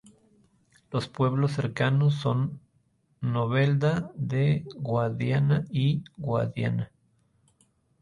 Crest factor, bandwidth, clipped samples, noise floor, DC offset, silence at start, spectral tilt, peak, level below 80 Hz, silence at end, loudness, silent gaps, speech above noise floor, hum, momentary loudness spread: 16 dB; 10.5 kHz; under 0.1%; -68 dBFS; under 0.1%; 0.9 s; -8 dB/octave; -12 dBFS; -58 dBFS; 1.15 s; -27 LUFS; none; 43 dB; none; 9 LU